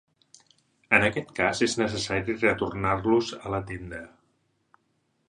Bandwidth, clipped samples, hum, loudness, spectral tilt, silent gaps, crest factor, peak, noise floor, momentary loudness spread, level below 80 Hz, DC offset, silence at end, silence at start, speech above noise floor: 11.5 kHz; under 0.1%; none; -26 LUFS; -4.5 dB/octave; none; 24 dB; -4 dBFS; -72 dBFS; 14 LU; -52 dBFS; under 0.1%; 1.2 s; 0.9 s; 46 dB